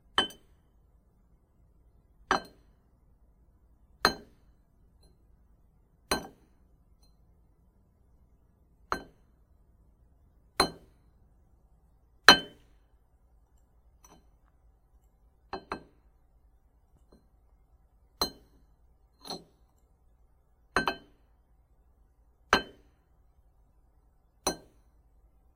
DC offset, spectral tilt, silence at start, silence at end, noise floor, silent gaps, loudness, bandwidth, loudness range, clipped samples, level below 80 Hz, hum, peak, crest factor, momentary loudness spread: under 0.1%; -1.5 dB/octave; 0.2 s; 1 s; -65 dBFS; none; -29 LUFS; 16 kHz; 22 LU; under 0.1%; -58 dBFS; none; 0 dBFS; 36 dB; 24 LU